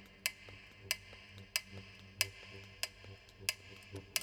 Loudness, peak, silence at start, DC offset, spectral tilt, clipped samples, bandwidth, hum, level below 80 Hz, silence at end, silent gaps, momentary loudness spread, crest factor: -41 LUFS; -12 dBFS; 0 s; under 0.1%; -0.5 dB/octave; under 0.1%; over 20 kHz; none; -68 dBFS; 0 s; none; 16 LU; 32 dB